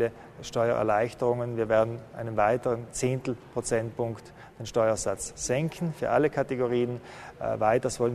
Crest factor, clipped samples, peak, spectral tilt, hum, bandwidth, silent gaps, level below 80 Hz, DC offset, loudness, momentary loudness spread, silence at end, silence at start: 18 dB; under 0.1%; -10 dBFS; -5.5 dB/octave; none; 13.5 kHz; none; -54 dBFS; under 0.1%; -28 LUFS; 9 LU; 0 s; 0 s